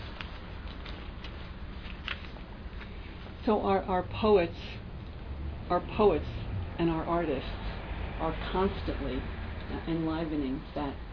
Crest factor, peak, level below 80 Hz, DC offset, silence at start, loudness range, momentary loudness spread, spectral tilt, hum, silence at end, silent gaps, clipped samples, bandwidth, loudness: 20 dB; -12 dBFS; -42 dBFS; under 0.1%; 0 s; 5 LU; 17 LU; -5.5 dB/octave; none; 0 s; none; under 0.1%; 5.4 kHz; -32 LUFS